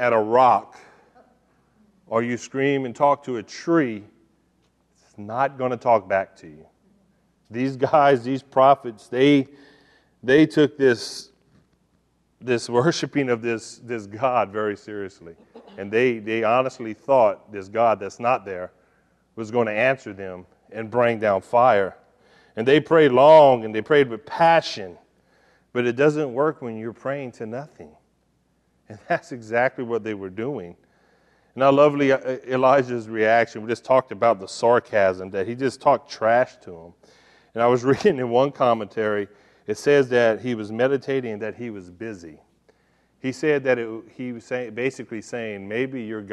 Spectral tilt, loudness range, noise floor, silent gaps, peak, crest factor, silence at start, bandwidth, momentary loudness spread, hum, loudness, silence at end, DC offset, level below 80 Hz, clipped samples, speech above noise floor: -6 dB/octave; 10 LU; -66 dBFS; none; -4 dBFS; 18 dB; 0 s; 11.5 kHz; 17 LU; none; -21 LUFS; 0 s; under 0.1%; -66 dBFS; under 0.1%; 45 dB